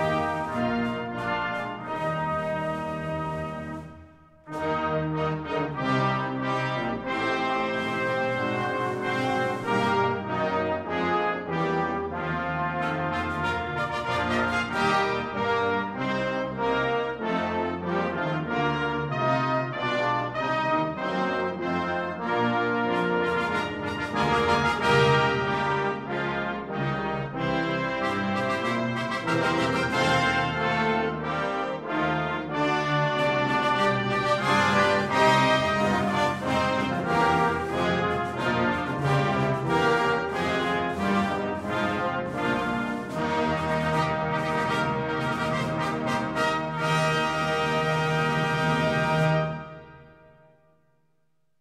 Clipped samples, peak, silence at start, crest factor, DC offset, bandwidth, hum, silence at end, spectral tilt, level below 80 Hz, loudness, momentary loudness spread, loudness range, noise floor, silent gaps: under 0.1%; -8 dBFS; 0 s; 18 dB; under 0.1%; 14.5 kHz; none; 1.6 s; -5.5 dB/octave; -52 dBFS; -26 LUFS; 7 LU; 5 LU; -75 dBFS; none